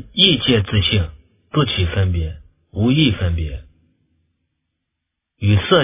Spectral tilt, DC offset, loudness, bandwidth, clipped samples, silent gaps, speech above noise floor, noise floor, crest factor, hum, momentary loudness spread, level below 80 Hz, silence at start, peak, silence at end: -10.5 dB/octave; under 0.1%; -17 LUFS; 3.9 kHz; under 0.1%; none; 62 dB; -79 dBFS; 18 dB; none; 16 LU; -30 dBFS; 0 s; 0 dBFS; 0 s